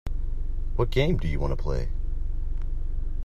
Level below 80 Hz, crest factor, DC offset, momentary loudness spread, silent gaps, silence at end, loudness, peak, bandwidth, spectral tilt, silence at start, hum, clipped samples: -26 dBFS; 16 dB; under 0.1%; 10 LU; none; 0 s; -30 LUFS; -8 dBFS; 6 kHz; -7.5 dB/octave; 0.05 s; none; under 0.1%